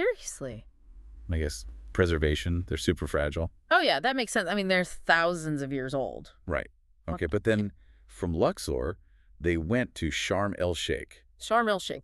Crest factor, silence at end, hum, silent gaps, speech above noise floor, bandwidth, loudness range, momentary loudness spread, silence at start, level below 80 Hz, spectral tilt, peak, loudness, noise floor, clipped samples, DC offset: 22 dB; 0 s; none; none; 20 dB; 13.5 kHz; 5 LU; 14 LU; 0 s; -42 dBFS; -5 dB/octave; -8 dBFS; -29 LUFS; -49 dBFS; under 0.1%; under 0.1%